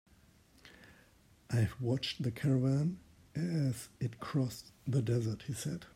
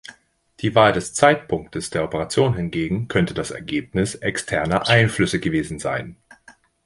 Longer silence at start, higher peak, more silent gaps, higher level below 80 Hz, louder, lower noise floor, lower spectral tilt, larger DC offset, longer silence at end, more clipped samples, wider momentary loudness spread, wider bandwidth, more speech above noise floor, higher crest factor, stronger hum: first, 0.65 s vs 0.1 s; second, -20 dBFS vs 0 dBFS; neither; second, -64 dBFS vs -46 dBFS; second, -35 LUFS vs -21 LUFS; first, -64 dBFS vs -53 dBFS; first, -6.5 dB/octave vs -5 dB/octave; neither; second, 0.05 s vs 0.7 s; neither; about the same, 9 LU vs 10 LU; first, 16 kHz vs 11.5 kHz; about the same, 30 dB vs 33 dB; about the same, 16 dB vs 20 dB; neither